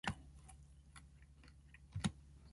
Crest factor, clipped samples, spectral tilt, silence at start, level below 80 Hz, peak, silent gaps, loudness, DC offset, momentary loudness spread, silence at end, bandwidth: 26 dB; under 0.1%; -4.5 dB/octave; 0.05 s; -60 dBFS; -24 dBFS; none; -47 LUFS; under 0.1%; 19 LU; 0 s; 11.5 kHz